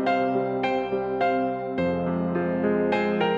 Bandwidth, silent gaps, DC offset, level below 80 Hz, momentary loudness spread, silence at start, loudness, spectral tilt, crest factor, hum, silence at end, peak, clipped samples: 7.4 kHz; none; under 0.1%; -56 dBFS; 3 LU; 0 s; -25 LUFS; -8 dB/octave; 14 dB; none; 0 s; -10 dBFS; under 0.1%